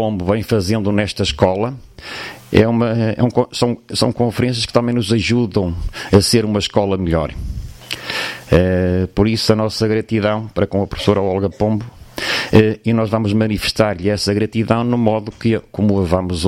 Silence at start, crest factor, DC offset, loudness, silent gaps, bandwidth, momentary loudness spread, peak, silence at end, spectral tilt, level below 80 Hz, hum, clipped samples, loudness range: 0 s; 16 dB; under 0.1%; -17 LUFS; none; 16 kHz; 9 LU; 0 dBFS; 0 s; -6 dB/octave; -36 dBFS; none; under 0.1%; 1 LU